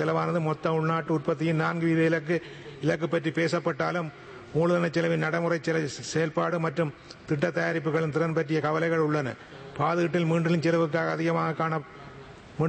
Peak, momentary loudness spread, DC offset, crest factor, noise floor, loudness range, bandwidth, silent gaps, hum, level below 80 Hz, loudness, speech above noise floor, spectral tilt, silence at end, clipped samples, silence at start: -12 dBFS; 9 LU; under 0.1%; 16 dB; -46 dBFS; 1 LU; 8.8 kHz; none; none; -64 dBFS; -27 LUFS; 20 dB; -6.5 dB/octave; 0 s; under 0.1%; 0 s